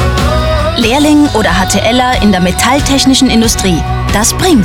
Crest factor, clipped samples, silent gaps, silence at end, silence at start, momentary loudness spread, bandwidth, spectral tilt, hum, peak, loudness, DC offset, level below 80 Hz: 8 dB; under 0.1%; none; 0 s; 0 s; 4 LU; 17.5 kHz; -4 dB/octave; none; 0 dBFS; -9 LUFS; 0.5%; -18 dBFS